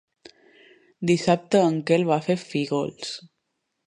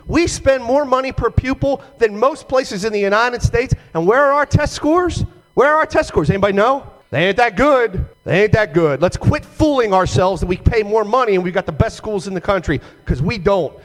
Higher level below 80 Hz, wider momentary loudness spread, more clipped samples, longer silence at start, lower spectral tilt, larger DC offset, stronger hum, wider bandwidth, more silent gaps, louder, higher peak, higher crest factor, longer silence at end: second, -66 dBFS vs -30 dBFS; first, 12 LU vs 7 LU; neither; first, 1 s vs 0.05 s; about the same, -6 dB/octave vs -6 dB/octave; neither; neither; second, 11 kHz vs 13.5 kHz; neither; second, -23 LUFS vs -16 LUFS; second, -6 dBFS vs 0 dBFS; first, 20 dB vs 14 dB; first, 0.65 s vs 0.05 s